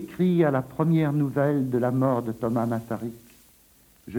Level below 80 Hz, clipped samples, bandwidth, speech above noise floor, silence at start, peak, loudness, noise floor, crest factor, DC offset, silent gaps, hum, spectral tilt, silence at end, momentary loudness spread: -60 dBFS; under 0.1%; 18 kHz; 33 dB; 0 s; -10 dBFS; -25 LUFS; -57 dBFS; 14 dB; under 0.1%; none; none; -9 dB/octave; 0 s; 8 LU